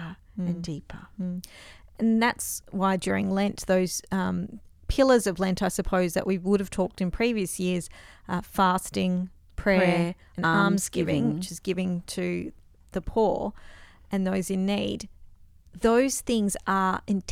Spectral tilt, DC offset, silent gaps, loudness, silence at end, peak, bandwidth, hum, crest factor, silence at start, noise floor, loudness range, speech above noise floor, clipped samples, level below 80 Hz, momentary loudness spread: -5 dB/octave; under 0.1%; none; -26 LUFS; 0 s; -8 dBFS; 16 kHz; none; 20 dB; 0 s; -51 dBFS; 4 LU; 25 dB; under 0.1%; -46 dBFS; 13 LU